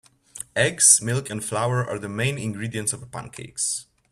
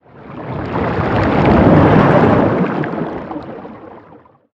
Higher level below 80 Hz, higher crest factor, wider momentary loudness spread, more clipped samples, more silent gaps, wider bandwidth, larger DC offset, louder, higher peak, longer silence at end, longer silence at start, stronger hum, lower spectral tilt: second, -58 dBFS vs -32 dBFS; first, 24 dB vs 14 dB; about the same, 19 LU vs 21 LU; neither; neither; first, 14.5 kHz vs 7.2 kHz; neither; second, -21 LUFS vs -13 LUFS; about the same, 0 dBFS vs 0 dBFS; second, 0.3 s vs 0.55 s; first, 0.35 s vs 0.2 s; neither; second, -3 dB/octave vs -9.5 dB/octave